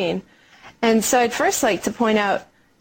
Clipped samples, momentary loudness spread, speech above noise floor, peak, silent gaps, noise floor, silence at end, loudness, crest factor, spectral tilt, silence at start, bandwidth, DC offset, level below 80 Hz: under 0.1%; 8 LU; 28 dB; -6 dBFS; none; -48 dBFS; 0.4 s; -20 LUFS; 16 dB; -3 dB/octave; 0 s; 17 kHz; under 0.1%; -56 dBFS